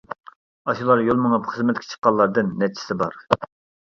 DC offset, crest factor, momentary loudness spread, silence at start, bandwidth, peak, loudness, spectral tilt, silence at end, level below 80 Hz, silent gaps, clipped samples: under 0.1%; 22 dB; 12 LU; 0.1 s; 7.4 kHz; 0 dBFS; -21 LUFS; -6.5 dB/octave; 0.35 s; -58 dBFS; 0.36-0.65 s, 1.98-2.02 s; under 0.1%